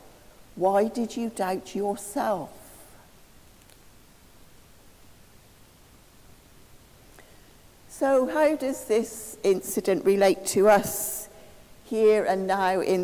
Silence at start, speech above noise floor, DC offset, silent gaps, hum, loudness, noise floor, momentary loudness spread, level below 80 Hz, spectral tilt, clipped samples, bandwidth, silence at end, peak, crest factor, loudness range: 0.55 s; 30 dB; under 0.1%; none; none; -25 LUFS; -54 dBFS; 12 LU; -60 dBFS; -4.5 dB/octave; under 0.1%; 16 kHz; 0 s; -8 dBFS; 20 dB; 11 LU